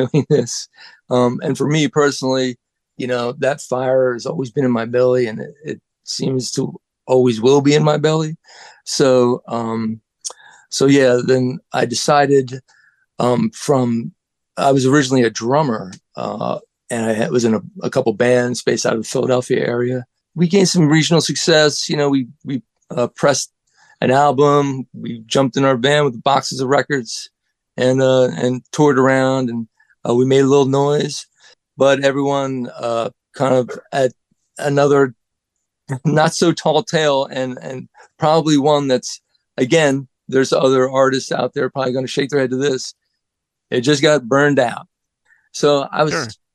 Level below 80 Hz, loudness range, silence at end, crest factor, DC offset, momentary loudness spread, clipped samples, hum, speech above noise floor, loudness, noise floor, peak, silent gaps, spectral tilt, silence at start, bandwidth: -62 dBFS; 3 LU; 0.2 s; 16 dB; under 0.1%; 14 LU; under 0.1%; none; 62 dB; -16 LUFS; -78 dBFS; 0 dBFS; none; -5 dB/octave; 0 s; 12.5 kHz